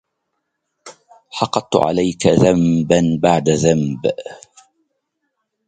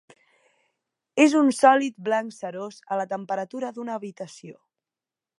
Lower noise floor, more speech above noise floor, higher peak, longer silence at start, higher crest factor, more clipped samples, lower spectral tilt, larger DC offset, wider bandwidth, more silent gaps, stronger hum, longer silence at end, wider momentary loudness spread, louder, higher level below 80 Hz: second, -74 dBFS vs under -90 dBFS; second, 58 dB vs over 67 dB; first, 0 dBFS vs -4 dBFS; second, 0.85 s vs 1.15 s; about the same, 18 dB vs 22 dB; neither; first, -6 dB/octave vs -4.5 dB/octave; neither; second, 9.4 kHz vs 11.5 kHz; neither; neither; first, 1.3 s vs 0.85 s; second, 10 LU vs 19 LU; first, -16 LUFS vs -23 LUFS; first, -46 dBFS vs -84 dBFS